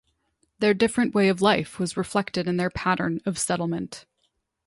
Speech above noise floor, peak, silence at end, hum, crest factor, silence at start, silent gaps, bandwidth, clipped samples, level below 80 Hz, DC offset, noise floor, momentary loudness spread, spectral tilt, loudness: 50 dB; -6 dBFS; 0.65 s; none; 18 dB; 0.6 s; none; 11.5 kHz; under 0.1%; -56 dBFS; under 0.1%; -73 dBFS; 8 LU; -5 dB/octave; -24 LUFS